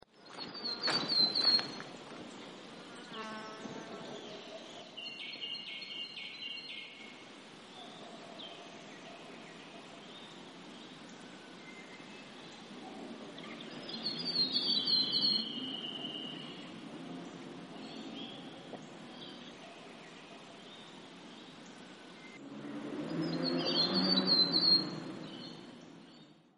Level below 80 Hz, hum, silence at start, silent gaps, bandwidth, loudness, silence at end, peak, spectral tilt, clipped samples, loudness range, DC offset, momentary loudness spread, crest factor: -80 dBFS; none; 0.15 s; none; 11.5 kHz; -33 LUFS; 0.15 s; -18 dBFS; -4 dB/octave; under 0.1%; 19 LU; under 0.1%; 23 LU; 22 dB